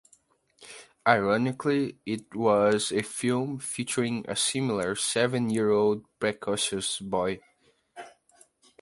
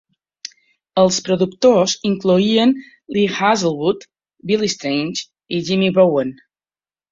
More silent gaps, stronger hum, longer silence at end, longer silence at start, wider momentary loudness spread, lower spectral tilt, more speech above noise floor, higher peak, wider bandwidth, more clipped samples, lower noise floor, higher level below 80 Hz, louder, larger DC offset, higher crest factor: neither; neither; about the same, 0.7 s vs 0.8 s; second, 0.6 s vs 0.95 s; about the same, 12 LU vs 14 LU; about the same, -4 dB/octave vs -5 dB/octave; second, 38 dB vs over 74 dB; second, -6 dBFS vs -2 dBFS; first, 11.5 kHz vs 7.8 kHz; neither; second, -64 dBFS vs under -90 dBFS; second, -64 dBFS vs -58 dBFS; second, -27 LUFS vs -17 LUFS; neither; first, 24 dB vs 16 dB